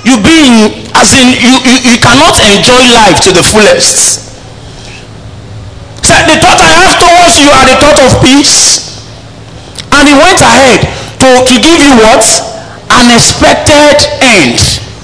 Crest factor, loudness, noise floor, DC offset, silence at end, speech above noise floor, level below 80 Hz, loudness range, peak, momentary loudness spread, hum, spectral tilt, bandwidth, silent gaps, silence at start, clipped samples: 4 dB; -2 LUFS; -26 dBFS; under 0.1%; 0 s; 23 dB; -24 dBFS; 4 LU; 0 dBFS; 6 LU; none; -2.5 dB/octave; 11 kHz; none; 0 s; 30%